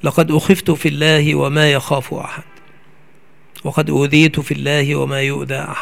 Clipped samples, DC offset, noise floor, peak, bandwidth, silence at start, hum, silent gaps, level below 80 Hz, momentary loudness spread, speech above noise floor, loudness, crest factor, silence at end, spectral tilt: under 0.1%; 0.9%; -51 dBFS; 0 dBFS; 16 kHz; 0.05 s; none; none; -50 dBFS; 12 LU; 36 dB; -15 LUFS; 16 dB; 0 s; -5.5 dB/octave